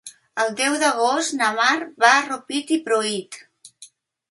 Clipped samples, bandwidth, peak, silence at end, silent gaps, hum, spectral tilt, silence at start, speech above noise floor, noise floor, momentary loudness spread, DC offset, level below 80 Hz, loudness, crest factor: under 0.1%; 11.5 kHz; 0 dBFS; 0.45 s; none; none; -1.5 dB/octave; 0.05 s; 29 dB; -49 dBFS; 13 LU; under 0.1%; -76 dBFS; -20 LUFS; 20 dB